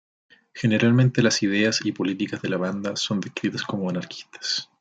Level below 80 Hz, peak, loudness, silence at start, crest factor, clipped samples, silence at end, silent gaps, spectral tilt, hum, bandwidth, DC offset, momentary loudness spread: -64 dBFS; -6 dBFS; -23 LUFS; 0.55 s; 18 dB; under 0.1%; 0.15 s; none; -5 dB/octave; none; 9.2 kHz; under 0.1%; 10 LU